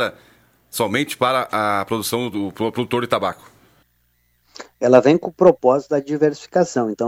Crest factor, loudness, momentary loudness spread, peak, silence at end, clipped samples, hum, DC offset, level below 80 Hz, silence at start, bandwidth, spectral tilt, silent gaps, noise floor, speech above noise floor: 18 dB; -19 LUFS; 10 LU; 0 dBFS; 0 s; under 0.1%; 60 Hz at -55 dBFS; under 0.1%; -60 dBFS; 0 s; 16.5 kHz; -5 dB/octave; none; -63 dBFS; 45 dB